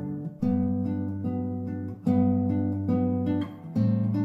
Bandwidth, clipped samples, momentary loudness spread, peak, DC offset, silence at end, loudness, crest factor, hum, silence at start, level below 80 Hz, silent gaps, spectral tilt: 5.4 kHz; under 0.1%; 7 LU; -12 dBFS; under 0.1%; 0 s; -27 LUFS; 14 dB; none; 0 s; -62 dBFS; none; -11 dB/octave